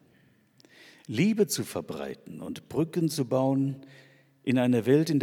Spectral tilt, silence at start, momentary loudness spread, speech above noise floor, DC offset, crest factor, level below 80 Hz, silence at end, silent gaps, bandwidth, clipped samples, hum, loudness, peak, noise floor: -6 dB/octave; 1.1 s; 16 LU; 36 dB; under 0.1%; 18 dB; -70 dBFS; 0 s; none; 17.5 kHz; under 0.1%; none; -27 LUFS; -10 dBFS; -63 dBFS